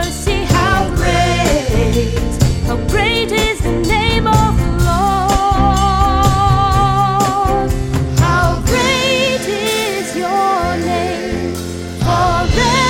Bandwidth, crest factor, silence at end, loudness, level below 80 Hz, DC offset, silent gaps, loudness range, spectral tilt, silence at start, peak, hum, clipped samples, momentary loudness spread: 17 kHz; 14 dB; 0 s; -14 LUFS; -22 dBFS; under 0.1%; none; 3 LU; -5 dB/octave; 0 s; 0 dBFS; none; under 0.1%; 5 LU